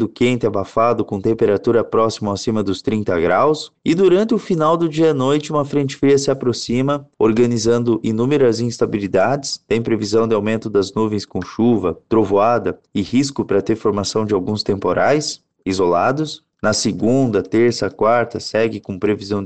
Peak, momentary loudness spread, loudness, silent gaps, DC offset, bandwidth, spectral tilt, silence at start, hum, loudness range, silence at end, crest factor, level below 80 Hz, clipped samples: -4 dBFS; 6 LU; -18 LUFS; none; 0.4%; 9 kHz; -5.5 dB/octave; 0 s; none; 2 LU; 0 s; 12 dB; -50 dBFS; under 0.1%